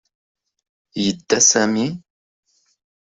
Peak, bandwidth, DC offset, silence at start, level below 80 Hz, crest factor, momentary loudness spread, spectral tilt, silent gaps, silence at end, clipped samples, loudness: -2 dBFS; 8.2 kHz; under 0.1%; 0.95 s; -60 dBFS; 20 dB; 17 LU; -2.5 dB/octave; none; 1.15 s; under 0.1%; -17 LUFS